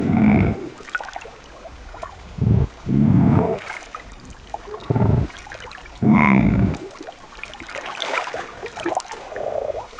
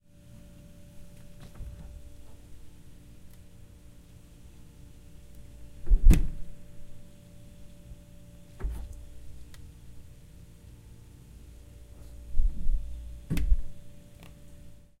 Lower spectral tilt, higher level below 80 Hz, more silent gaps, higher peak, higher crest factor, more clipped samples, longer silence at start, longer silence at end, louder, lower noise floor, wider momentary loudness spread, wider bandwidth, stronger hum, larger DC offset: about the same, -7.5 dB/octave vs -6.5 dB/octave; about the same, -36 dBFS vs -32 dBFS; neither; first, 0 dBFS vs -6 dBFS; about the same, 20 dB vs 24 dB; neither; second, 0 s vs 0.95 s; second, 0 s vs 0.3 s; first, -20 LUFS vs -32 LUFS; second, -40 dBFS vs -51 dBFS; about the same, 21 LU vs 22 LU; second, 9.2 kHz vs 14.5 kHz; neither; neither